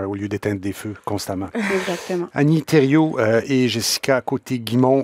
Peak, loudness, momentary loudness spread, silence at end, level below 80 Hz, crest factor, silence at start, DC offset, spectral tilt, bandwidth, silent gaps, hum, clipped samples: -2 dBFS; -20 LUFS; 10 LU; 0 s; -58 dBFS; 18 dB; 0 s; under 0.1%; -5.5 dB/octave; 16 kHz; none; none; under 0.1%